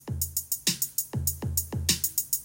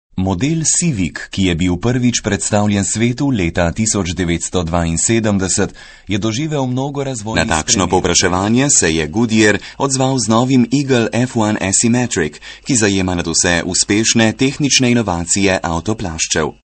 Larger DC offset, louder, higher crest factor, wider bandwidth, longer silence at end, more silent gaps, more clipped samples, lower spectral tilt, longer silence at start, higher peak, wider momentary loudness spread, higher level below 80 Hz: neither; second, -27 LUFS vs -15 LUFS; first, 22 dB vs 16 dB; first, 17.5 kHz vs 9 kHz; second, 0 s vs 0.25 s; neither; neither; second, -2.5 dB/octave vs -4 dB/octave; second, 0 s vs 0.15 s; second, -8 dBFS vs 0 dBFS; second, 4 LU vs 7 LU; second, -48 dBFS vs -36 dBFS